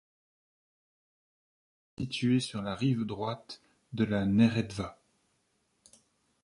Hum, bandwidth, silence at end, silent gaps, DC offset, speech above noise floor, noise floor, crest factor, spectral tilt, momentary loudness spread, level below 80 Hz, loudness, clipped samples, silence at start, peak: none; 11.5 kHz; 1.5 s; none; under 0.1%; 45 dB; -75 dBFS; 22 dB; -6.5 dB/octave; 17 LU; -60 dBFS; -30 LUFS; under 0.1%; 2 s; -12 dBFS